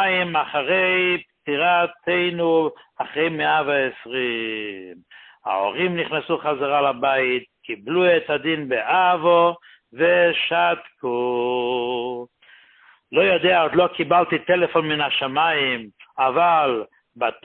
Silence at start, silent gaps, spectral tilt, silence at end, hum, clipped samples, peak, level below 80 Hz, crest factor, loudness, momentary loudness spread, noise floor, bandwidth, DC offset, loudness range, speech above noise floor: 0 s; none; -9.5 dB/octave; 0.1 s; none; under 0.1%; -4 dBFS; -64 dBFS; 16 dB; -20 LUFS; 10 LU; -54 dBFS; 4.3 kHz; under 0.1%; 4 LU; 33 dB